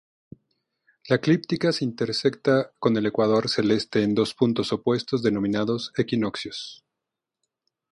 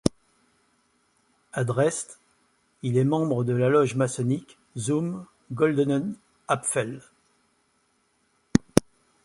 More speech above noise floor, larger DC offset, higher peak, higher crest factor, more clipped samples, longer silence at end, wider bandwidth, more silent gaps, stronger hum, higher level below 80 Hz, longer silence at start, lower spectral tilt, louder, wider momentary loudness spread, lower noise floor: first, 62 dB vs 44 dB; neither; second, -6 dBFS vs 0 dBFS; second, 18 dB vs 28 dB; neither; first, 1.15 s vs 0.45 s; second, 11.5 kHz vs 16 kHz; neither; neither; second, -62 dBFS vs -54 dBFS; first, 1.05 s vs 0.05 s; about the same, -6 dB/octave vs -6 dB/octave; about the same, -24 LUFS vs -26 LUFS; second, 5 LU vs 14 LU; first, -85 dBFS vs -69 dBFS